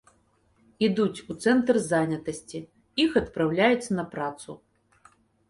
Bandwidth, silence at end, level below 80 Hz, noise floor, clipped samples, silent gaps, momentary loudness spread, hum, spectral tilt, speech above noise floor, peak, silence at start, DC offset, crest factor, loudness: 11.5 kHz; 0.95 s; -58 dBFS; -65 dBFS; under 0.1%; none; 17 LU; none; -5.5 dB/octave; 40 dB; -6 dBFS; 0.8 s; under 0.1%; 20 dB; -26 LUFS